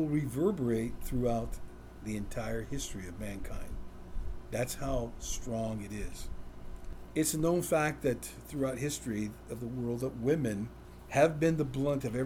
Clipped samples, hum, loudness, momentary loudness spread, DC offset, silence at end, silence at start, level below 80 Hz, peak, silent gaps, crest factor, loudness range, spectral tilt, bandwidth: under 0.1%; none; -34 LUFS; 17 LU; under 0.1%; 0 s; 0 s; -46 dBFS; -12 dBFS; none; 20 dB; 6 LU; -5.5 dB/octave; over 20 kHz